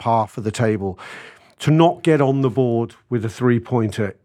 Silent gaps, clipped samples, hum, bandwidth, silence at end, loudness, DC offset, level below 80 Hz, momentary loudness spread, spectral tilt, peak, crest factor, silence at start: none; under 0.1%; none; 13 kHz; 0.15 s; -19 LUFS; under 0.1%; -58 dBFS; 11 LU; -7.5 dB/octave; 0 dBFS; 18 dB; 0 s